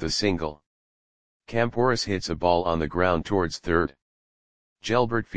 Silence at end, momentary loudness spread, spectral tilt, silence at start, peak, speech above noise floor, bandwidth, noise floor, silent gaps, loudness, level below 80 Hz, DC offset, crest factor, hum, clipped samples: 0 s; 8 LU; -5 dB/octave; 0 s; -6 dBFS; over 66 dB; 9.8 kHz; under -90 dBFS; 0.66-1.40 s, 4.02-4.76 s; -25 LUFS; -46 dBFS; 0.8%; 20 dB; none; under 0.1%